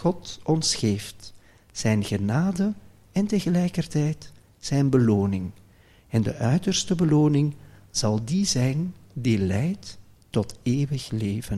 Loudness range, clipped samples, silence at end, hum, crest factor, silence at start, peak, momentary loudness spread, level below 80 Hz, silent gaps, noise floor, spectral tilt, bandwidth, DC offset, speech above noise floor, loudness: 3 LU; under 0.1%; 0 s; none; 18 dB; 0 s; -8 dBFS; 12 LU; -50 dBFS; none; -54 dBFS; -5.5 dB/octave; 14 kHz; under 0.1%; 31 dB; -25 LUFS